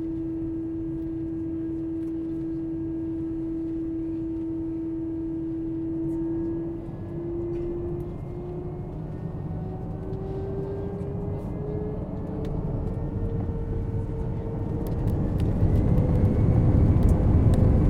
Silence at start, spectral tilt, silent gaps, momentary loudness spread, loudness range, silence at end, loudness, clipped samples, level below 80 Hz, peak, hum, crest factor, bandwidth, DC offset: 0 s; -10.5 dB/octave; none; 12 LU; 9 LU; 0 s; -28 LUFS; under 0.1%; -34 dBFS; -8 dBFS; none; 18 dB; 9 kHz; under 0.1%